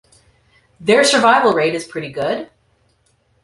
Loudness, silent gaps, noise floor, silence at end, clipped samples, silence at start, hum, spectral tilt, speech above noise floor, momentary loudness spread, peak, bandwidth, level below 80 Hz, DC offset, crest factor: -15 LUFS; none; -60 dBFS; 1 s; under 0.1%; 0.8 s; none; -3 dB/octave; 45 dB; 15 LU; -2 dBFS; 11.5 kHz; -60 dBFS; under 0.1%; 16 dB